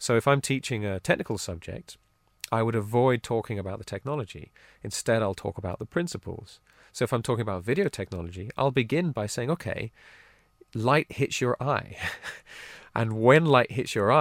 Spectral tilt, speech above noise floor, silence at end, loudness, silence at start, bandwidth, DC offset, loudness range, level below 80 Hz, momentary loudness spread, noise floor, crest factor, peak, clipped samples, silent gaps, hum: -5.5 dB/octave; 32 dB; 0 s; -27 LUFS; 0 s; 16 kHz; under 0.1%; 6 LU; -56 dBFS; 17 LU; -59 dBFS; 22 dB; -4 dBFS; under 0.1%; none; none